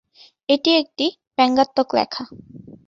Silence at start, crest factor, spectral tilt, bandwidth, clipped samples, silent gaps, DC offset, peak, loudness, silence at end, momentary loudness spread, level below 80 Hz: 0.5 s; 18 dB; -4.5 dB/octave; 7.8 kHz; under 0.1%; 1.27-1.31 s; under 0.1%; -4 dBFS; -19 LUFS; 0.15 s; 14 LU; -62 dBFS